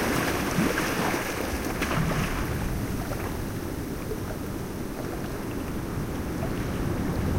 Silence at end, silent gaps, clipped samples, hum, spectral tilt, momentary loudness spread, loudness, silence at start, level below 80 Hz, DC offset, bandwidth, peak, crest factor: 0 s; none; under 0.1%; none; -5 dB/octave; 8 LU; -29 LUFS; 0 s; -38 dBFS; under 0.1%; 16 kHz; -12 dBFS; 18 dB